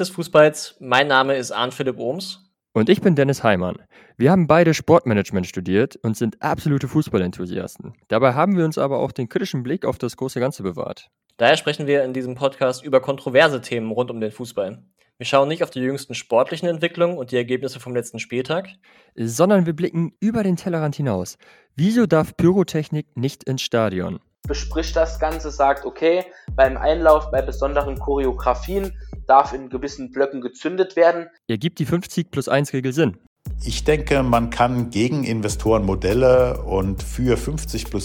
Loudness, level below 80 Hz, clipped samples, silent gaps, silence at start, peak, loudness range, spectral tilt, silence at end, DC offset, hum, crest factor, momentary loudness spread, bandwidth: -20 LUFS; -36 dBFS; under 0.1%; 33.27-33.36 s; 0 s; 0 dBFS; 4 LU; -6 dB/octave; 0 s; under 0.1%; none; 20 dB; 12 LU; 18 kHz